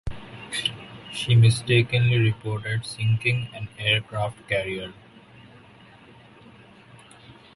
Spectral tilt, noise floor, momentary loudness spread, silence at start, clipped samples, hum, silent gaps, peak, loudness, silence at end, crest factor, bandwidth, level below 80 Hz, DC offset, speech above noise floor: -5.5 dB/octave; -50 dBFS; 17 LU; 0.05 s; under 0.1%; none; none; -6 dBFS; -23 LUFS; 0.25 s; 18 dB; 11.5 kHz; -50 dBFS; under 0.1%; 28 dB